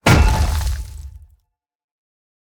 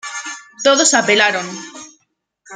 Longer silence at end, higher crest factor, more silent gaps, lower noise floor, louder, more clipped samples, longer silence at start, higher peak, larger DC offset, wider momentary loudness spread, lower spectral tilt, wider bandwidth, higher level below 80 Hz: first, 1.35 s vs 0 s; about the same, 20 dB vs 16 dB; neither; about the same, -65 dBFS vs -66 dBFS; second, -18 LUFS vs -13 LUFS; neither; about the same, 0.05 s vs 0.05 s; about the same, 0 dBFS vs 0 dBFS; neither; first, 24 LU vs 19 LU; first, -5 dB/octave vs -1 dB/octave; first, 20 kHz vs 10 kHz; first, -22 dBFS vs -66 dBFS